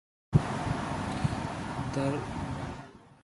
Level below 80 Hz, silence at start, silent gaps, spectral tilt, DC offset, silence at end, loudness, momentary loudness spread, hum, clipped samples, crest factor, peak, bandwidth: -46 dBFS; 0.3 s; none; -6.5 dB/octave; under 0.1%; 0.1 s; -33 LUFS; 10 LU; none; under 0.1%; 24 dB; -10 dBFS; 11.5 kHz